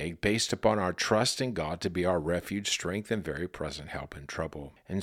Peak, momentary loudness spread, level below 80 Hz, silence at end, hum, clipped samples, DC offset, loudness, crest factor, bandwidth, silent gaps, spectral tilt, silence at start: -10 dBFS; 12 LU; -52 dBFS; 0 s; none; under 0.1%; under 0.1%; -31 LUFS; 22 dB; 16.5 kHz; none; -4 dB/octave; 0 s